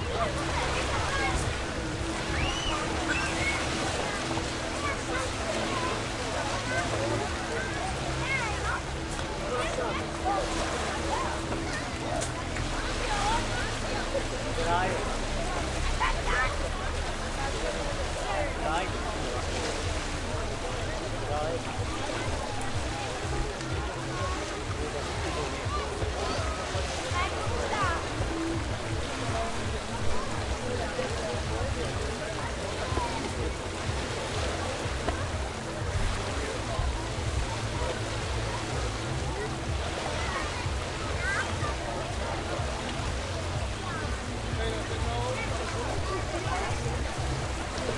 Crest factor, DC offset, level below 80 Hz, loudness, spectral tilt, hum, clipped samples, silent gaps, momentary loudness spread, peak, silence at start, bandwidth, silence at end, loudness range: 16 dB; under 0.1%; -38 dBFS; -31 LUFS; -4 dB/octave; none; under 0.1%; none; 4 LU; -14 dBFS; 0 s; 11.5 kHz; 0 s; 3 LU